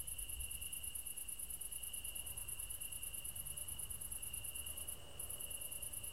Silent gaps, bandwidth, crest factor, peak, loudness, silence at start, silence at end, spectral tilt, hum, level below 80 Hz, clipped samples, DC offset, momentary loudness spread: none; 16 kHz; 18 dB; -30 dBFS; -44 LUFS; 0 s; 0 s; -0.5 dB/octave; none; -58 dBFS; under 0.1%; 0.2%; 1 LU